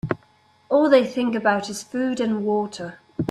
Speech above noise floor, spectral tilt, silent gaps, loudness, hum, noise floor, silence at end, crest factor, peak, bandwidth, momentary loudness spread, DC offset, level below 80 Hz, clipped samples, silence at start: 37 dB; -5.5 dB/octave; none; -22 LUFS; none; -58 dBFS; 0 s; 18 dB; -4 dBFS; 13 kHz; 14 LU; under 0.1%; -58 dBFS; under 0.1%; 0.05 s